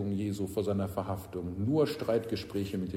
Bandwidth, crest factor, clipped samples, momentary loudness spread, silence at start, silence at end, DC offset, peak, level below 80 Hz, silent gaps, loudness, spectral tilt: 16 kHz; 16 dB; under 0.1%; 8 LU; 0 s; 0 s; under 0.1%; -16 dBFS; -58 dBFS; none; -33 LUFS; -7 dB/octave